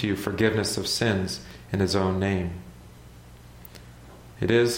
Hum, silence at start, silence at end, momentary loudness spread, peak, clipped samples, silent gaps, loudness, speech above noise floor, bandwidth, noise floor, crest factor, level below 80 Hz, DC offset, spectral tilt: none; 0 s; 0 s; 23 LU; -6 dBFS; under 0.1%; none; -26 LUFS; 22 dB; 16.5 kHz; -47 dBFS; 20 dB; -50 dBFS; under 0.1%; -5 dB/octave